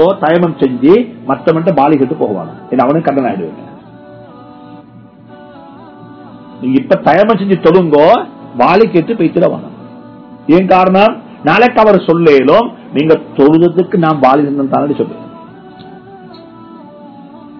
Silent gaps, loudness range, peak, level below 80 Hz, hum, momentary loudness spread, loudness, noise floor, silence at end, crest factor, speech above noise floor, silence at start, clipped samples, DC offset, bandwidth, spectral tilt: none; 9 LU; 0 dBFS; -48 dBFS; none; 10 LU; -10 LUFS; -37 dBFS; 0 s; 12 dB; 27 dB; 0 s; 2%; under 0.1%; 5.4 kHz; -9 dB/octave